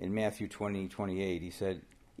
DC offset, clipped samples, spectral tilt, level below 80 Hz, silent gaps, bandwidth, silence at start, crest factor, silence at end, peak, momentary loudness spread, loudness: under 0.1%; under 0.1%; -6.5 dB/octave; -62 dBFS; none; 15.5 kHz; 0 s; 16 dB; 0.35 s; -20 dBFS; 6 LU; -37 LUFS